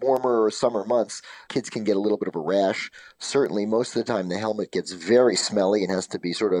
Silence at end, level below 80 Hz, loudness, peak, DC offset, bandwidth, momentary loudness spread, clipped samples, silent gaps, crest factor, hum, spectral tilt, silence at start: 0 s; -68 dBFS; -24 LUFS; -6 dBFS; under 0.1%; 11 kHz; 9 LU; under 0.1%; none; 16 dB; none; -4.5 dB/octave; 0 s